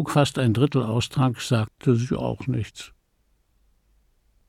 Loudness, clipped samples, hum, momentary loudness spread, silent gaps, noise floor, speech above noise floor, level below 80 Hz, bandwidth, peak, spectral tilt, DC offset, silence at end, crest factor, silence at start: -23 LUFS; under 0.1%; none; 10 LU; none; -67 dBFS; 44 dB; -52 dBFS; 14 kHz; -6 dBFS; -6.5 dB/octave; under 0.1%; 1.6 s; 18 dB; 0 s